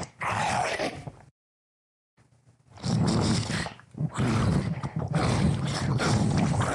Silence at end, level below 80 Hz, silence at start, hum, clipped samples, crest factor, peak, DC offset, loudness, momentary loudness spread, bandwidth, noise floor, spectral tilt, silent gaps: 0 s; -46 dBFS; 0 s; none; under 0.1%; 14 dB; -14 dBFS; under 0.1%; -27 LUFS; 9 LU; 11.5 kHz; -61 dBFS; -5.5 dB/octave; 1.31-2.17 s